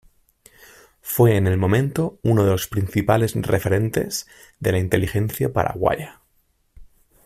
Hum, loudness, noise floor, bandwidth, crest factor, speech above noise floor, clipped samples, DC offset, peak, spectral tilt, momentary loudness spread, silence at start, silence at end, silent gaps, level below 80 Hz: none; -21 LUFS; -64 dBFS; 16 kHz; 20 dB; 45 dB; under 0.1%; under 0.1%; -2 dBFS; -6.5 dB/octave; 9 LU; 1.05 s; 0.4 s; none; -46 dBFS